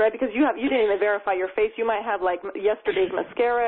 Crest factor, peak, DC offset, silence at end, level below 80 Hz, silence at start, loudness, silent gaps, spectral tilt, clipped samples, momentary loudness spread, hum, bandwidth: 14 dB; -8 dBFS; under 0.1%; 0 s; -56 dBFS; 0 s; -24 LUFS; none; -9 dB/octave; under 0.1%; 4 LU; none; 4.2 kHz